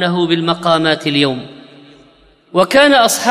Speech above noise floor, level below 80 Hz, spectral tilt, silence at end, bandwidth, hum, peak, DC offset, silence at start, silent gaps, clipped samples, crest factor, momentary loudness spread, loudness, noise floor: 36 dB; -52 dBFS; -4 dB/octave; 0 s; 15.5 kHz; none; 0 dBFS; under 0.1%; 0 s; none; under 0.1%; 14 dB; 8 LU; -12 LUFS; -48 dBFS